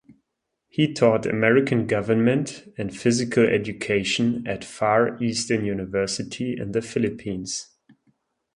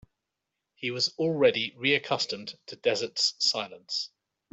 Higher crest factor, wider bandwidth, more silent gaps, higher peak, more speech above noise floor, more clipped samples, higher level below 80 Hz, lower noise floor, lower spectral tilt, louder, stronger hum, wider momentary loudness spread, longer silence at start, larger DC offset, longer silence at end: about the same, 20 dB vs 22 dB; first, 11 kHz vs 8.2 kHz; neither; first, -4 dBFS vs -8 dBFS; about the same, 56 dB vs 57 dB; neither; first, -56 dBFS vs -74 dBFS; second, -79 dBFS vs -85 dBFS; first, -5 dB/octave vs -3 dB/octave; first, -23 LUFS vs -27 LUFS; neither; about the same, 11 LU vs 11 LU; second, 0.1 s vs 0.8 s; neither; first, 0.9 s vs 0.45 s